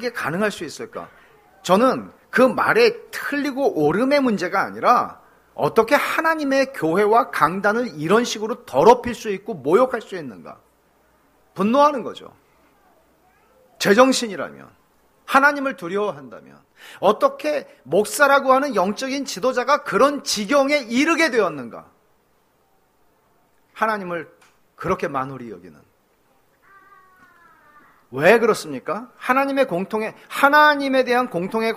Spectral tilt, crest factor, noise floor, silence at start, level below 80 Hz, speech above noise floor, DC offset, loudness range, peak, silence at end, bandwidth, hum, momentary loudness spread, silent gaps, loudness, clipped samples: -4 dB/octave; 20 dB; -62 dBFS; 0 s; -60 dBFS; 42 dB; under 0.1%; 10 LU; 0 dBFS; 0 s; 15.5 kHz; none; 16 LU; none; -19 LUFS; under 0.1%